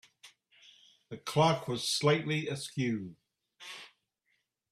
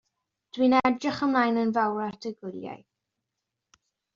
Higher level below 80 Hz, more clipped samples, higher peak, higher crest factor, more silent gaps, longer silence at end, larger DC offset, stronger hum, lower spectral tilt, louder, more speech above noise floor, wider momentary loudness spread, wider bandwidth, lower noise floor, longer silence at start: about the same, -72 dBFS vs -68 dBFS; neither; about the same, -12 dBFS vs -10 dBFS; about the same, 22 dB vs 18 dB; neither; second, 0.85 s vs 1.4 s; neither; neither; about the same, -4.5 dB/octave vs -3.5 dB/octave; second, -31 LUFS vs -25 LUFS; second, 48 dB vs 59 dB; about the same, 20 LU vs 18 LU; first, 14.5 kHz vs 7.4 kHz; second, -79 dBFS vs -85 dBFS; second, 0.25 s vs 0.55 s